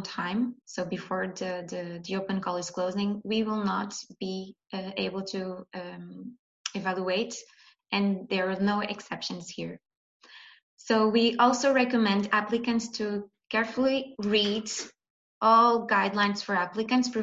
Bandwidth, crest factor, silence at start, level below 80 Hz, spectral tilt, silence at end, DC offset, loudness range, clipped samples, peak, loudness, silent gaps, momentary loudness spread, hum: 8 kHz; 20 dB; 0 s; -68 dBFS; -4.5 dB/octave; 0 s; under 0.1%; 8 LU; under 0.1%; -8 dBFS; -28 LUFS; 6.39-6.65 s, 9.97-10.20 s, 10.63-10.77 s, 15.10-15.41 s; 16 LU; none